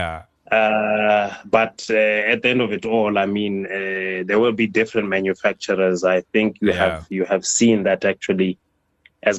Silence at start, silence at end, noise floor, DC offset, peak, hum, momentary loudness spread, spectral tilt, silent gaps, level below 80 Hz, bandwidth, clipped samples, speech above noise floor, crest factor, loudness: 0 s; 0 s; -58 dBFS; under 0.1%; -2 dBFS; none; 7 LU; -4 dB/octave; none; -52 dBFS; 10 kHz; under 0.1%; 39 dB; 16 dB; -19 LUFS